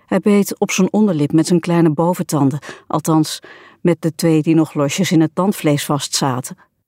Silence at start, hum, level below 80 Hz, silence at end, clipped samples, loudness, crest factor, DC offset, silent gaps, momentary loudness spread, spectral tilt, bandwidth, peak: 0.1 s; none; -62 dBFS; 0.35 s; under 0.1%; -16 LUFS; 14 dB; under 0.1%; none; 7 LU; -5.5 dB/octave; 16.5 kHz; -2 dBFS